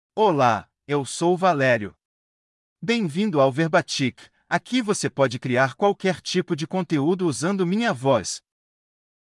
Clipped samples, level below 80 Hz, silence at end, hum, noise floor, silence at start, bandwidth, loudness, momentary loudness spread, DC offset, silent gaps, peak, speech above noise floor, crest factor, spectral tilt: under 0.1%; -70 dBFS; 0.85 s; none; under -90 dBFS; 0.15 s; 12 kHz; -22 LUFS; 8 LU; under 0.1%; 2.05-2.76 s; -6 dBFS; over 68 dB; 18 dB; -5 dB/octave